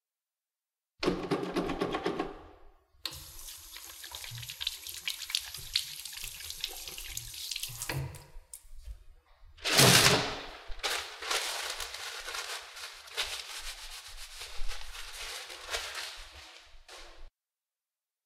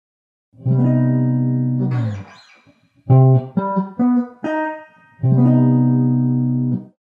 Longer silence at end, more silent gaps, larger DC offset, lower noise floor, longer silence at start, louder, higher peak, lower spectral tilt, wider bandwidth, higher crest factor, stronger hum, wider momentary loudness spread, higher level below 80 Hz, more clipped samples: first, 1 s vs 0.2 s; neither; neither; first, under -90 dBFS vs -54 dBFS; first, 1 s vs 0.6 s; second, -32 LUFS vs -17 LUFS; second, -6 dBFS vs -2 dBFS; second, -2.5 dB/octave vs -11.5 dB/octave; first, 17 kHz vs 3.3 kHz; first, 28 dB vs 16 dB; neither; first, 18 LU vs 10 LU; first, -50 dBFS vs -64 dBFS; neither